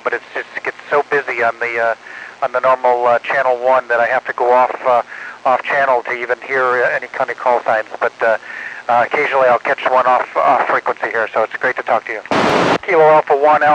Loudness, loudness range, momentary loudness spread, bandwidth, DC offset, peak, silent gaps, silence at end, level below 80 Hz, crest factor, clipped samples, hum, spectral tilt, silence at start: -15 LUFS; 2 LU; 8 LU; 9.8 kHz; under 0.1%; 0 dBFS; none; 0 s; -62 dBFS; 14 dB; under 0.1%; none; -4.5 dB/octave; 0.05 s